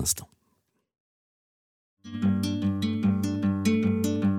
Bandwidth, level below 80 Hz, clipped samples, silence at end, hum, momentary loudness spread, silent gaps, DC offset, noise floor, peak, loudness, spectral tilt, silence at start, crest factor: 18 kHz; -56 dBFS; under 0.1%; 0 s; none; 4 LU; 1.00-1.97 s; under 0.1%; -73 dBFS; -12 dBFS; -26 LUFS; -5.5 dB/octave; 0 s; 16 dB